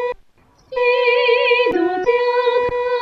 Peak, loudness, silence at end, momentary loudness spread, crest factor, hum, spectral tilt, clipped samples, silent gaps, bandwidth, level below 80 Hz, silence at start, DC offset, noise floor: -4 dBFS; -16 LUFS; 0 s; 9 LU; 14 dB; none; -4.5 dB/octave; under 0.1%; none; 6.2 kHz; -50 dBFS; 0 s; under 0.1%; -53 dBFS